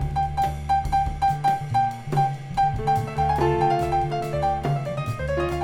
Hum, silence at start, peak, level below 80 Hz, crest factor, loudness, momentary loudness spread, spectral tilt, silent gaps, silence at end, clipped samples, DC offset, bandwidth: none; 0 s; -8 dBFS; -36 dBFS; 14 dB; -24 LUFS; 5 LU; -7 dB/octave; none; 0 s; under 0.1%; under 0.1%; 17 kHz